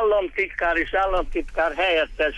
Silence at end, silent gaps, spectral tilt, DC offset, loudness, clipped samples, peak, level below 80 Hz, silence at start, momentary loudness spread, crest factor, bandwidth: 0 s; none; -5 dB/octave; under 0.1%; -22 LUFS; under 0.1%; -10 dBFS; -38 dBFS; 0 s; 4 LU; 12 dB; 10.5 kHz